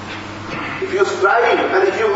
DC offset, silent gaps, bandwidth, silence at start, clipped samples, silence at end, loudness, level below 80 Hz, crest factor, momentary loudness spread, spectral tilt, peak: under 0.1%; none; 8 kHz; 0 s; under 0.1%; 0 s; -16 LUFS; -52 dBFS; 14 dB; 13 LU; -4.5 dB/octave; -2 dBFS